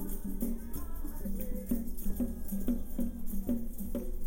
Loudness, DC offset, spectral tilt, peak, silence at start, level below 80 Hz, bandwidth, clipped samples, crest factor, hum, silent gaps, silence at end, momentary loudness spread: -38 LUFS; under 0.1%; -7 dB/octave; -16 dBFS; 0 s; -36 dBFS; 17 kHz; under 0.1%; 16 dB; none; none; 0 s; 6 LU